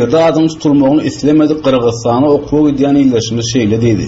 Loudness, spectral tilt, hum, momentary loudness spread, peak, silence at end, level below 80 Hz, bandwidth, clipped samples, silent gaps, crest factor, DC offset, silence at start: -11 LUFS; -6.5 dB/octave; none; 3 LU; 0 dBFS; 0 s; -38 dBFS; 8 kHz; under 0.1%; none; 10 dB; under 0.1%; 0 s